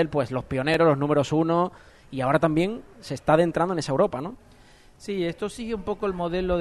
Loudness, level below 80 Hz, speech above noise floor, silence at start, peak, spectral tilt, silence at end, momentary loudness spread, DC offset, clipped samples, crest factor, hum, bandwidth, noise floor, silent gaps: -24 LUFS; -48 dBFS; 28 dB; 0 s; -6 dBFS; -6.5 dB/octave; 0 s; 13 LU; under 0.1%; under 0.1%; 18 dB; none; 12.5 kHz; -52 dBFS; none